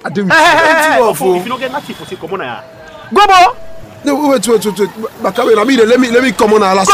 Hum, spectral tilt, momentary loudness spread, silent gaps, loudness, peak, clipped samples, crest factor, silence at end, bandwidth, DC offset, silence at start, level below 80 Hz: none; -3.5 dB/octave; 15 LU; none; -10 LUFS; 0 dBFS; under 0.1%; 10 dB; 0 s; 16 kHz; under 0.1%; 0.05 s; -44 dBFS